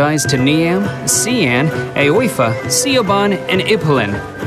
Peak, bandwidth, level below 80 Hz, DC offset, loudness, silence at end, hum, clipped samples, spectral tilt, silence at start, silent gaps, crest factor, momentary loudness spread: -2 dBFS; 13.5 kHz; -46 dBFS; under 0.1%; -14 LUFS; 0 s; none; under 0.1%; -4 dB/octave; 0 s; none; 12 dB; 3 LU